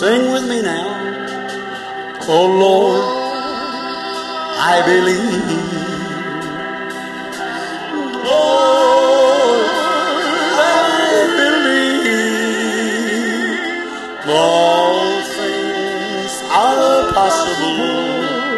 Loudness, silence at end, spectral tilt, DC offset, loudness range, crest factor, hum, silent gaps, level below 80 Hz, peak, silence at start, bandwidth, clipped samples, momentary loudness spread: -15 LUFS; 0 s; -3.5 dB/octave; under 0.1%; 5 LU; 14 dB; none; none; -52 dBFS; 0 dBFS; 0 s; 12.5 kHz; under 0.1%; 12 LU